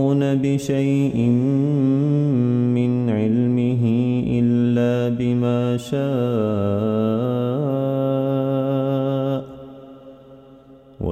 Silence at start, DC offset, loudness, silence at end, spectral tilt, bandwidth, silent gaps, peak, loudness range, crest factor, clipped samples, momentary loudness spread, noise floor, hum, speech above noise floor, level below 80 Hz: 0 s; under 0.1%; -20 LUFS; 0 s; -9 dB/octave; 13 kHz; none; -6 dBFS; 4 LU; 12 dB; under 0.1%; 4 LU; -46 dBFS; none; 27 dB; -52 dBFS